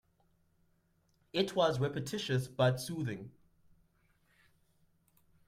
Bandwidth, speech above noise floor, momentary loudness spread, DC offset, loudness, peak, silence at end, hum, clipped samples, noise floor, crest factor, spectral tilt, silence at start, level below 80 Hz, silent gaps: 16 kHz; 40 dB; 10 LU; under 0.1%; -34 LUFS; -16 dBFS; 2.15 s; none; under 0.1%; -73 dBFS; 20 dB; -5.5 dB/octave; 1.35 s; -70 dBFS; none